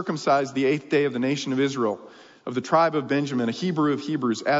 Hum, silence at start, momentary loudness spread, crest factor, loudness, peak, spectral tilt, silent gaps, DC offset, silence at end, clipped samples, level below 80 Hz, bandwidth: none; 0 s; 7 LU; 16 dB; -24 LUFS; -8 dBFS; -5.5 dB/octave; none; under 0.1%; 0 s; under 0.1%; -74 dBFS; 7.8 kHz